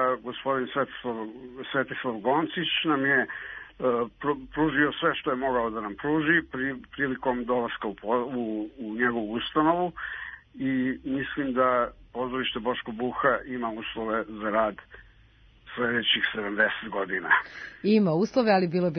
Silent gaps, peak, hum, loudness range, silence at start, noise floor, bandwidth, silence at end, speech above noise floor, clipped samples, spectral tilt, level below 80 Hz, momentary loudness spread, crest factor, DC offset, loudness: none; -8 dBFS; none; 3 LU; 0 s; -57 dBFS; 6.4 kHz; 0 s; 30 dB; under 0.1%; -6.5 dB/octave; -56 dBFS; 10 LU; 20 dB; under 0.1%; -27 LUFS